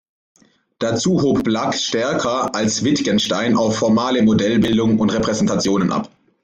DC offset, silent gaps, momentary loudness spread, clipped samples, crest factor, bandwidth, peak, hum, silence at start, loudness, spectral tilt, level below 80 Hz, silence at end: under 0.1%; none; 4 LU; under 0.1%; 12 dB; 9.4 kHz; -6 dBFS; none; 0.8 s; -17 LUFS; -5 dB/octave; -48 dBFS; 0.35 s